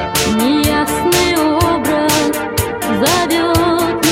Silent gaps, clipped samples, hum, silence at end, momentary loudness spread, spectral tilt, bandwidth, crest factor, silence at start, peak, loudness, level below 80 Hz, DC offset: none; under 0.1%; none; 0 s; 4 LU; -4 dB/octave; 17 kHz; 14 dB; 0 s; 0 dBFS; -14 LUFS; -32 dBFS; under 0.1%